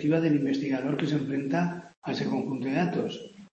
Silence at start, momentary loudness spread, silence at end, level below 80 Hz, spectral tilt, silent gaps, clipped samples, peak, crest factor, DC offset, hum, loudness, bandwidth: 0 s; 9 LU; 0.05 s; -70 dBFS; -7.5 dB/octave; 1.97-2.02 s; under 0.1%; -12 dBFS; 16 dB; under 0.1%; none; -29 LUFS; 8.2 kHz